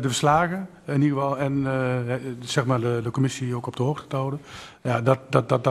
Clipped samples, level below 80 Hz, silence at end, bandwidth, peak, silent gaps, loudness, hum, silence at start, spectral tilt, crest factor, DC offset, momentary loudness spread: under 0.1%; -56 dBFS; 0 s; 13 kHz; -2 dBFS; none; -24 LUFS; none; 0 s; -6 dB/octave; 22 dB; under 0.1%; 9 LU